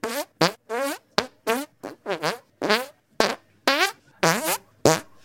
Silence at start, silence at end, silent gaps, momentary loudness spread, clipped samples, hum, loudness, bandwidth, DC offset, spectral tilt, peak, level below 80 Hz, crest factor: 0.05 s; 0.2 s; none; 9 LU; under 0.1%; none; -24 LUFS; 17 kHz; under 0.1%; -3 dB/octave; 0 dBFS; -60 dBFS; 26 dB